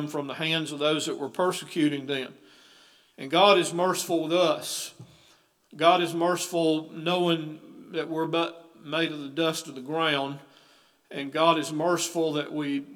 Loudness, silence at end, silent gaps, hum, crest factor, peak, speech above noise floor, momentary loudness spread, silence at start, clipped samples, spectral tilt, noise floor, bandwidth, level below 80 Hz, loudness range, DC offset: -26 LUFS; 0 s; none; none; 22 dB; -6 dBFS; 35 dB; 13 LU; 0 s; under 0.1%; -4 dB/octave; -61 dBFS; 19 kHz; -84 dBFS; 4 LU; under 0.1%